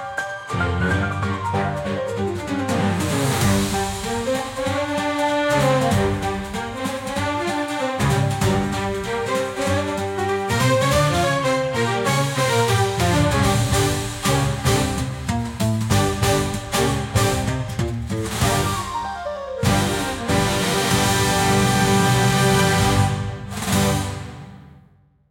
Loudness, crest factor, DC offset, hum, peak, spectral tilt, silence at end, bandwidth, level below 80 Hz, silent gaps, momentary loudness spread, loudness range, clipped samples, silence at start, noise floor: -20 LUFS; 16 dB; under 0.1%; none; -4 dBFS; -4.5 dB/octave; 0.55 s; 17 kHz; -38 dBFS; none; 8 LU; 4 LU; under 0.1%; 0 s; -54 dBFS